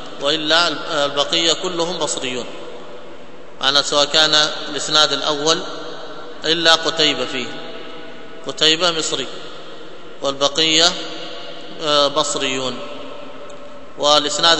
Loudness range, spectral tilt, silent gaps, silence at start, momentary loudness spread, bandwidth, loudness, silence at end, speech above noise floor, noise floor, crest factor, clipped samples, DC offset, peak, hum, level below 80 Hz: 4 LU; -1.5 dB/octave; none; 0 s; 22 LU; 11 kHz; -16 LUFS; 0 s; 21 dB; -39 dBFS; 20 dB; under 0.1%; 3%; 0 dBFS; none; -58 dBFS